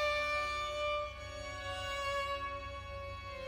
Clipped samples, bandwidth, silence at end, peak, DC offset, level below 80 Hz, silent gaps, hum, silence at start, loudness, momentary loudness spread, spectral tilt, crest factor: under 0.1%; 16.5 kHz; 0 s; -24 dBFS; under 0.1%; -52 dBFS; none; none; 0 s; -38 LUFS; 11 LU; -3 dB/octave; 14 dB